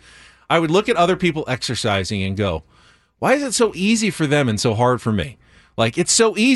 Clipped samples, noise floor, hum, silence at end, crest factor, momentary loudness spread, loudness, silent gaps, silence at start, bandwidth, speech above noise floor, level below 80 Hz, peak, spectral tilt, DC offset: under 0.1%; -46 dBFS; none; 0 s; 16 dB; 8 LU; -18 LUFS; none; 0.5 s; 12 kHz; 28 dB; -46 dBFS; -2 dBFS; -4 dB/octave; under 0.1%